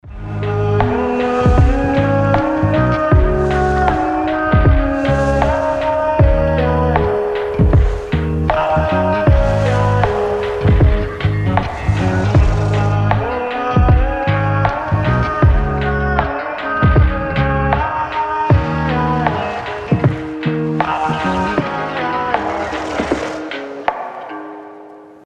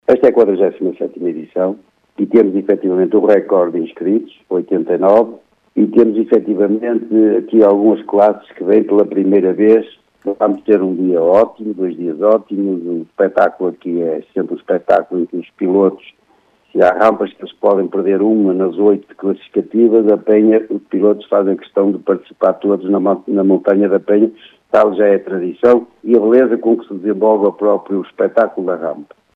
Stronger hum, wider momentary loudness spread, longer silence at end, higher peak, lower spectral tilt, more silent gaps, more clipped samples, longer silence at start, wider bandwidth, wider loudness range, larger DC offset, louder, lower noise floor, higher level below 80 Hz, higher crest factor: neither; second, 7 LU vs 10 LU; second, 0.15 s vs 0.3 s; about the same, 0 dBFS vs 0 dBFS; second, -8 dB/octave vs -9.5 dB/octave; neither; neither; about the same, 0.05 s vs 0.1 s; first, 9 kHz vs 5 kHz; about the same, 4 LU vs 3 LU; neither; about the same, -16 LUFS vs -14 LUFS; second, -37 dBFS vs -55 dBFS; first, -22 dBFS vs -62 dBFS; about the same, 14 dB vs 14 dB